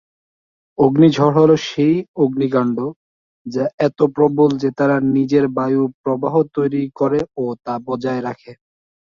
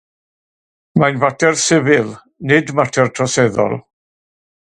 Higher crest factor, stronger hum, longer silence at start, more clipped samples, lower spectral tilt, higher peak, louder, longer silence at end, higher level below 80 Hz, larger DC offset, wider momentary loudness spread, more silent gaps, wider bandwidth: about the same, 16 dB vs 16 dB; neither; second, 0.8 s vs 0.95 s; neither; first, -8 dB/octave vs -4.5 dB/octave; about the same, -2 dBFS vs 0 dBFS; about the same, -17 LUFS vs -15 LUFS; second, 0.55 s vs 0.9 s; about the same, -56 dBFS vs -54 dBFS; neither; first, 12 LU vs 8 LU; first, 2.08-2.14 s, 2.96-3.45 s, 3.74-3.78 s, 5.94-6.04 s vs none; second, 7.2 kHz vs 11.5 kHz